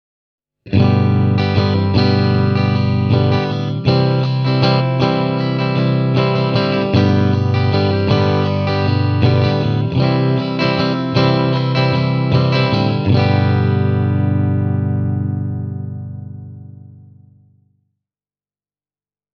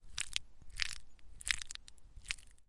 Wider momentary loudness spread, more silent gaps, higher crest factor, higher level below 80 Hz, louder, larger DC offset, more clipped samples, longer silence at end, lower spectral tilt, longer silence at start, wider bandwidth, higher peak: second, 6 LU vs 13 LU; neither; second, 16 dB vs 34 dB; first, -46 dBFS vs -54 dBFS; first, -15 LUFS vs -41 LUFS; second, under 0.1% vs 0.1%; neither; first, 2.5 s vs 0 s; first, -8.5 dB/octave vs 1.5 dB/octave; first, 0.65 s vs 0.05 s; second, 6.4 kHz vs 11.5 kHz; first, 0 dBFS vs -10 dBFS